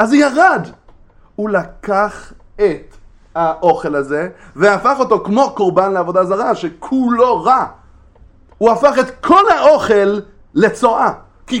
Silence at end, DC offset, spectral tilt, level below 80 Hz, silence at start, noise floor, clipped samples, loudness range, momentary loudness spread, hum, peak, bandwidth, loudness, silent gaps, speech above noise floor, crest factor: 0 s; under 0.1%; -5.5 dB/octave; -44 dBFS; 0 s; -44 dBFS; under 0.1%; 5 LU; 12 LU; none; 0 dBFS; 11.5 kHz; -14 LUFS; none; 31 dB; 14 dB